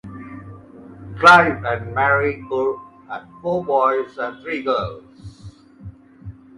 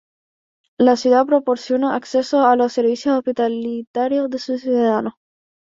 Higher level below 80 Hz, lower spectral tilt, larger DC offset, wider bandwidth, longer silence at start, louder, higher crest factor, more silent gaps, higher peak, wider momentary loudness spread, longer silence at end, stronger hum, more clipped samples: first, -48 dBFS vs -64 dBFS; about the same, -5.5 dB/octave vs -5 dB/octave; neither; first, 11.5 kHz vs 7.8 kHz; second, 0.05 s vs 0.8 s; about the same, -18 LUFS vs -18 LUFS; about the same, 20 dB vs 16 dB; second, none vs 3.87-3.94 s; about the same, 0 dBFS vs -2 dBFS; first, 26 LU vs 8 LU; second, 0.25 s vs 0.5 s; neither; neither